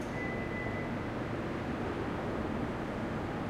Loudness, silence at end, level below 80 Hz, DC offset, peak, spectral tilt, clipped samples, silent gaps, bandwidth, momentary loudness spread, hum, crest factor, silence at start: -36 LUFS; 0 s; -50 dBFS; under 0.1%; -24 dBFS; -7 dB/octave; under 0.1%; none; 15.5 kHz; 1 LU; none; 12 dB; 0 s